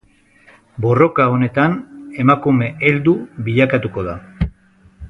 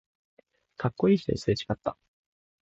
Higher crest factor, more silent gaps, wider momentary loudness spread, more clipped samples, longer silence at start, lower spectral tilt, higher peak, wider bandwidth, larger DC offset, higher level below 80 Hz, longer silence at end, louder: about the same, 16 dB vs 18 dB; neither; first, 12 LU vs 9 LU; neither; about the same, 0.75 s vs 0.8 s; first, -9 dB/octave vs -7 dB/octave; first, 0 dBFS vs -12 dBFS; second, 6.2 kHz vs 8 kHz; neither; first, -38 dBFS vs -54 dBFS; second, 0 s vs 0.7 s; first, -16 LUFS vs -28 LUFS